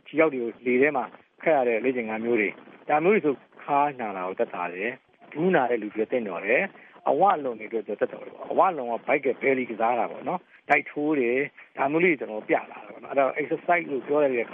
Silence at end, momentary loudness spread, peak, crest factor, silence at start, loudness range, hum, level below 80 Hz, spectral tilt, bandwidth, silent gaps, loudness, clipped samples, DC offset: 0 s; 10 LU; -6 dBFS; 18 dB; 0.1 s; 2 LU; none; -80 dBFS; -4.5 dB/octave; 3.8 kHz; none; -25 LUFS; under 0.1%; under 0.1%